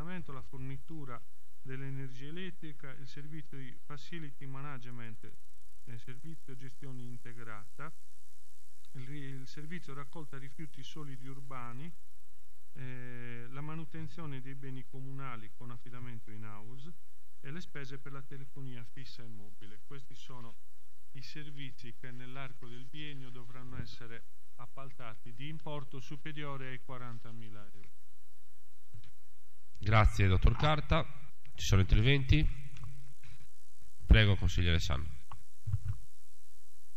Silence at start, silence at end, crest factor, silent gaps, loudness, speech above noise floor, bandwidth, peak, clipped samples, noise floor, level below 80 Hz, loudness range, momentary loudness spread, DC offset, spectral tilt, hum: 0 s; 0.95 s; 28 dB; none; -37 LUFS; 34 dB; 15 kHz; -8 dBFS; under 0.1%; -71 dBFS; -42 dBFS; 19 LU; 24 LU; 3%; -6 dB/octave; none